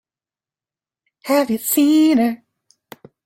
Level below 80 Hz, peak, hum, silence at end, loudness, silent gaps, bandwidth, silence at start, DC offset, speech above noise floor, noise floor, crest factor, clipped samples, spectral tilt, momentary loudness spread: -66 dBFS; -4 dBFS; none; 0.9 s; -16 LUFS; none; 16.5 kHz; 1.25 s; under 0.1%; over 75 dB; under -90 dBFS; 16 dB; under 0.1%; -3.5 dB/octave; 16 LU